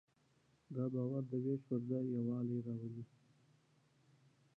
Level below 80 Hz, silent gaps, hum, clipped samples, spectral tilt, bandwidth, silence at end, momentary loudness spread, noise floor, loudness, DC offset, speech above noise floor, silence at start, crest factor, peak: -84 dBFS; none; none; under 0.1%; -11.5 dB/octave; 4 kHz; 1.5 s; 10 LU; -75 dBFS; -41 LUFS; under 0.1%; 35 dB; 0.7 s; 14 dB; -28 dBFS